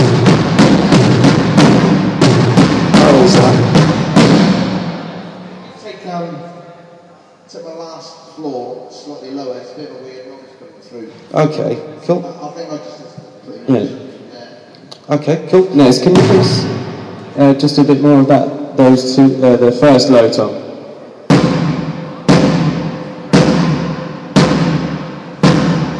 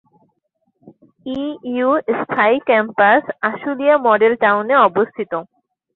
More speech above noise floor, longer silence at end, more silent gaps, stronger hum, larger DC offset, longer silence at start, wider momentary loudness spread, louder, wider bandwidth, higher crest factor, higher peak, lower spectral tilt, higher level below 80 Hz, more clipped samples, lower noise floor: second, 31 dB vs 52 dB; second, 0 s vs 0.5 s; neither; neither; neither; second, 0 s vs 0.85 s; first, 22 LU vs 12 LU; first, -11 LUFS vs -16 LUFS; first, 11 kHz vs 4.3 kHz; about the same, 12 dB vs 16 dB; about the same, 0 dBFS vs -2 dBFS; second, -6.5 dB/octave vs -8 dB/octave; first, -42 dBFS vs -64 dBFS; first, 0.2% vs under 0.1%; second, -42 dBFS vs -68 dBFS